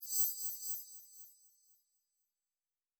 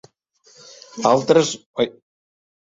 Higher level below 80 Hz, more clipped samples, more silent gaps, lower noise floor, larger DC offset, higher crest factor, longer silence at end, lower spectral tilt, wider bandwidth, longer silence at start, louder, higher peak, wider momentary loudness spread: second, under -90 dBFS vs -62 dBFS; neither; second, none vs 1.66-1.74 s; first, under -90 dBFS vs -57 dBFS; neither; about the same, 24 dB vs 20 dB; first, 1.65 s vs 0.7 s; second, 8.5 dB/octave vs -4.5 dB/octave; first, over 20 kHz vs 7.8 kHz; second, 0 s vs 0.95 s; second, -36 LUFS vs -19 LUFS; second, -20 dBFS vs -2 dBFS; first, 22 LU vs 9 LU